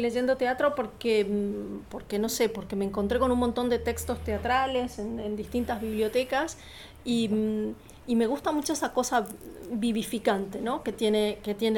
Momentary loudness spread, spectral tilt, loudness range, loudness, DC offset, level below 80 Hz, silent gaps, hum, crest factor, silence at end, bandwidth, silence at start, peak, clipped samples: 9 LU; -4.5 dB/octave; 2 LU; -28 LUFS; under 0.1%; -48 dBFS; none; none; 16 dB; 0 s; 18.5 kHz; 0 s; -12 dBFS; under 0.1%